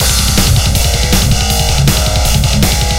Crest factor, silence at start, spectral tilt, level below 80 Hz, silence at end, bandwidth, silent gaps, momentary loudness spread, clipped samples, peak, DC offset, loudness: 10 dB; 0 s; -3.5 dB/octave; -14 dBFS; 0 s; 17 kHz; none; 2 LU; 0.1%; 0 dBFS; under 0.1%; -11 LUFS